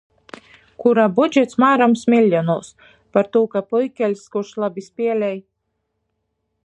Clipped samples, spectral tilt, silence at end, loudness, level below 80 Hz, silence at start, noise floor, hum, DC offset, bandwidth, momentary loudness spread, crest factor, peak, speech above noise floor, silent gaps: under 0.1%; -6.5 dB/octave; 1.25 s; -18 LUFS; -68 dBFS; 0.8 s; -74 dBFS; none; under 0.1%; 9 kHz; 10 LU; 18 dB; -2 dBFS; 56 dB; none